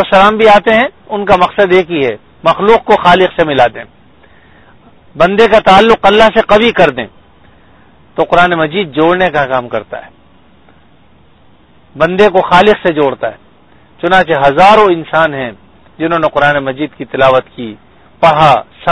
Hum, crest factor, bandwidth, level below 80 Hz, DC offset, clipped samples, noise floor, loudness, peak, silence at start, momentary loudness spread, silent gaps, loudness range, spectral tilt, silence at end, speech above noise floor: none; 10 dB; 11 kHz; -38 dBFS; under 0.1%; 2%; -45 dBFS; -9 LUFS; 0 dBFS; 0 s; 14 LU; none; 4 LU; -6 dB/octave; 0 s; 37 dB